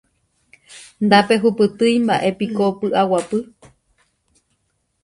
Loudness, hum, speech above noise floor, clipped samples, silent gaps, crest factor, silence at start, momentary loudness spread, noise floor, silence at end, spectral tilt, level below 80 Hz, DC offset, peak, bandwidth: -17 LUFS; none; 52 dB; under 0.1%; none; 20 dB; 0.7 s; 10 LU; -69 dBFS; 1.6 s; -5.5 dB/octave; -60 dBFS; under 0.1%; 0 dBFS; 11.5 kHz